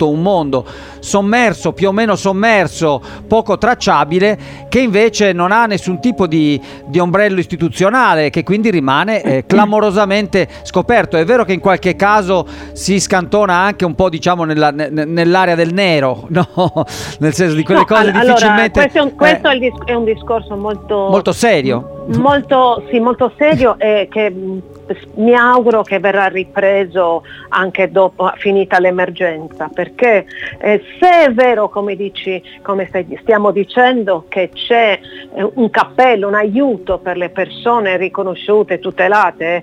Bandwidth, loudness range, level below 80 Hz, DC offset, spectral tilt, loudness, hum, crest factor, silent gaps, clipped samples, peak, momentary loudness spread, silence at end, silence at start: 16 kHz; 3 LU; -40 dBFS; under 0.1%; -5.5 dB/octave; -13 LUFS; none; 12 dB; none; under 0.1%; 0 dBFS; 9 LU; 0 s; 0 s